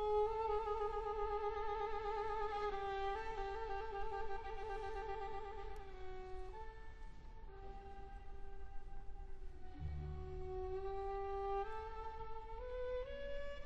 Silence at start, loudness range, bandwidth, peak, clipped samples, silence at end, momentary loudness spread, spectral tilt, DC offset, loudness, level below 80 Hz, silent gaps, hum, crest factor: 0 s; 13 LU; 7.8 kHz; -28 dBFS; under 0.1%; 0 s; 16 LU; -6.5 dB/octave; under 0.1%; -45 LUFS; -50 dBFS; none; none; 16 dB